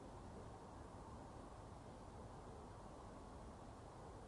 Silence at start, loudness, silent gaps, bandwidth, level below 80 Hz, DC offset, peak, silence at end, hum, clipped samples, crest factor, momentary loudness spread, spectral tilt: 0 s; -57 LUFS; none; 11 kHz; -64 dBFS; under 0.1%; -44 dBFS; 0 s; none; under 0.1%; 12 dB; 1 LU; -6 dB/octave